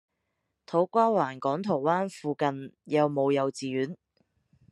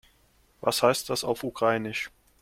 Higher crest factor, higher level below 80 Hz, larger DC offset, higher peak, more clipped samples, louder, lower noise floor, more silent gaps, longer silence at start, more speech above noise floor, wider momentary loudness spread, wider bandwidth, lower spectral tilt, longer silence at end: about the same, 18 dB vs 22 dB; second, -76 dBFS vs -62 dBFS; neither; second, -10 dBFS vs -6 dBFS; neither; about the same, -28 LUFS vs -27 LUFS; first, -80 dBFS vs -63 dBFS; neither; about the same, 0.7 s vs 0.6 s; first, 53 dB vs 37 dB; about the same, 9 LU vs 9 LU; second, 11.5 kHz vs 16.5 kHz; first, -6.5 dB/octave vs -3.5 dB/octave; first, 0.75 s vs 0.35 s